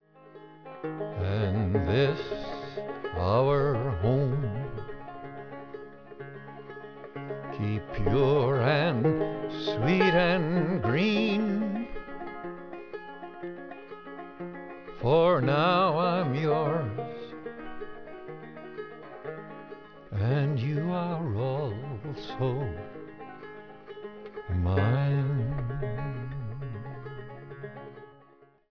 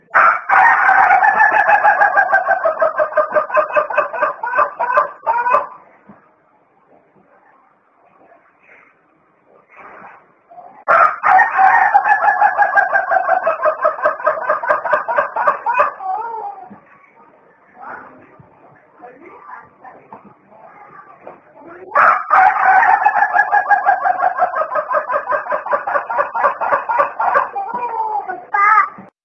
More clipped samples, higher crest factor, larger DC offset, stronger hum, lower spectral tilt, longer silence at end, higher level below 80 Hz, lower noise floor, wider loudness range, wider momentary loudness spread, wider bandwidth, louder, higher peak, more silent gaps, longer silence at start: neither; about the same, 18 dB vs 16 dB; first, 0.2% vs under 0.1%; neither; first, -8.5 dB/octave vs -4.5 dB/octave; about the same, 0.25 s vs 0.2 s; first, -50 dBFS vs -64 dBFS; about the same, -59 dBFS vs -56 dBFS; about the same, 11 LU vs 9 LU; first, 20 LU vs 10 LU; second, 5.4 kHz vs 6.8 kHz; second, -28 LUFS vs -14 LUFS; second, -10 dBFS vs 0 dBFS; neither; about the same, 0.15 s vs 0.15 s